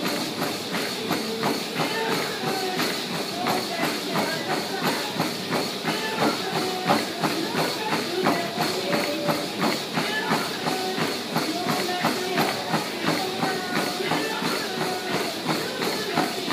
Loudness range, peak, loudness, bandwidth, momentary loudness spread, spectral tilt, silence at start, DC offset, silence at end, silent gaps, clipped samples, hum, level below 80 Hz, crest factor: 1 LU; -8 dBFS; -25 LUFS; 15.5 kHz; 3 LU; -3.5 dB/octave; 0 s; under 0.1%; 0 s; none; under 0.1%; none; -68 dBFS; 18 dB